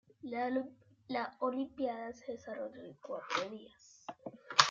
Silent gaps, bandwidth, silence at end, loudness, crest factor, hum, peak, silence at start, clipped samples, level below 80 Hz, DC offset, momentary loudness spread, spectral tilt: none; 9 kHz; 0 s; -38 LUFS; 32 dB; none; -6 dBFS; 0.25 s; under 0.1%; -80 dBFS; under 0.1%; 15 LU; -2 dB/octave